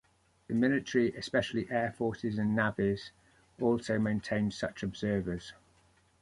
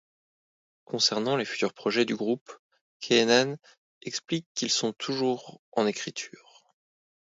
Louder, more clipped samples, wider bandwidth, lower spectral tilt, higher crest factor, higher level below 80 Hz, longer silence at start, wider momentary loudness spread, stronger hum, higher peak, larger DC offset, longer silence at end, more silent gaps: second, -32 LUFS vs -27 LUFS; neither; first, 11.5 kHz vs 8 kHz; first, -6.5 dB/octave vs -3 dB/octave; about the same, 18 dB vs 22 dB; first, -58 dBFS vs -78 dBFS; second, 0.5 s vs 0.9 s; second, 7 LU vs 14 LU; neither; second, -14 dBFS vs -6 dBFS; neither; second, 0.7 s vs 1.1 s; second, none vs 2.41-2.46 s, 2.59-2.70 s, 2.81-3.00 s, 3.78-4.01 s, 4.46-4.55 s, 5.59-5.72 s